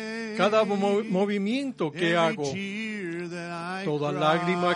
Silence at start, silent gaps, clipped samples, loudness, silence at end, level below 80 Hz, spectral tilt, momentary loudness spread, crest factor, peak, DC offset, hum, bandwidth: 0 s; none; under 0.1%; -27 LUFS; 0 s; -72 dBFS; -5.5 dB/octave; 10 LU; 20 dB; -8 dBFS; under 0.1%; none; 10.5 kHz